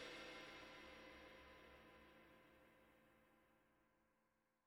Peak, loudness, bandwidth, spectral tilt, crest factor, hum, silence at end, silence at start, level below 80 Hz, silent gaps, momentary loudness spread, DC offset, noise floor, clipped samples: -42 dBFS; -60 LUFS; 18 kHz; -3.5 dB/octave; 20 dB; none; 0.1 s; 0 s; -80 dBFS; none; 12 LU; under 0.1%; -86 dBFS; under 0.1%